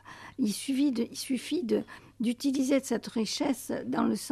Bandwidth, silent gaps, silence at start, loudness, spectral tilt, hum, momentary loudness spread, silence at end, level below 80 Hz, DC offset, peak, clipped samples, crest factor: 14.5 kHz; none; 0.05 s; -30 LUFS; -4.5 dB/octave; none; 6 LU; 0 s; -66 dBFS; under 0.1%; -14 dBFS; under 0.1%; 16 dB